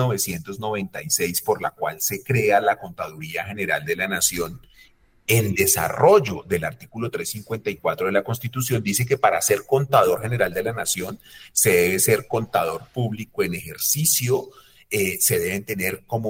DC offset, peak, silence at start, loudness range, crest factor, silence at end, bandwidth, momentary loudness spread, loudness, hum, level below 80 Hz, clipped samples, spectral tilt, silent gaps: under 0.1%; -4 dBFS; 0 s; 3 LU; 20 dB; 0 s; 18 kHz; 11 LU; -22 LUFS; none; -54 dBFS; under 0.1%; -3.5 dB/octave; none